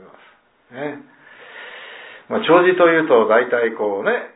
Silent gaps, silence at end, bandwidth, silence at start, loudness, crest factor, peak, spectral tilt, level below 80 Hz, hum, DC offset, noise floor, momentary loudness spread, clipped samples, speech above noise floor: none; 0.1 s; 4 kHz; 0.75 s; -16 LUFS; 18 dB; 0 dBFS; -9 dB/octave; -68 dBFS; none; under 0.1%; -53 dBFS; 23 LU; under 0.1%; 36 dB